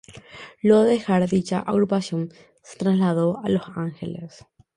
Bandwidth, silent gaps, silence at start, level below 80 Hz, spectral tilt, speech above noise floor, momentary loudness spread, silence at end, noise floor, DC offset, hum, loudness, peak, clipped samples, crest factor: 11 kHz; none; 0.1 s; -60 dBFS; -7.5 dB/octave; 22 dB; 20 LU; 0.5 s; -43 dBFS; under 0.1%; none; -22 LUFS; -4 dBFS; under 0.1%; 18 dB